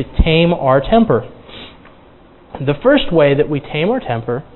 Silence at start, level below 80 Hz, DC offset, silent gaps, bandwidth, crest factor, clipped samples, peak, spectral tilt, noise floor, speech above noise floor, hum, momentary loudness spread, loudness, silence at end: 0 s; -28 dBFS; under 0.1%; none; 4.2 kHz; 16 dB; under 0.1%; 0 dBFS; -10.5 dB/octave; -44 dBFS; 30 dB; none; 21 LU; -14 LUFS; 0.15 s